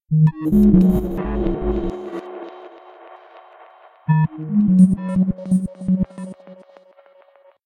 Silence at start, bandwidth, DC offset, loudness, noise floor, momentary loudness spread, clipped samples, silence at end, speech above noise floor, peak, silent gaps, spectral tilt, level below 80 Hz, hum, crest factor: 0.1 s; 14 kHz; under 0.1%; -18 LUFS; -52 dBFS; 21 LU; under 0.1%; 1.1 s; 35 dB; -2 dBFS; none; -10 dB/octave; -34 dBFS; none; 18 dB